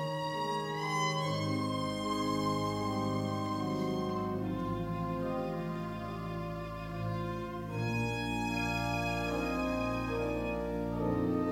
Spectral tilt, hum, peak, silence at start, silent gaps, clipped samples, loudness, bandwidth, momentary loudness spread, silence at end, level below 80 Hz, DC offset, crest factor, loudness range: -6 dB/octave; none; -20 dBFS; 0 s; none; under 0.1%; -35 LUFS; 16 kHz; 6 LU; 0 s; -50 dBFS; under 0.1%; 14 dB; 3 LU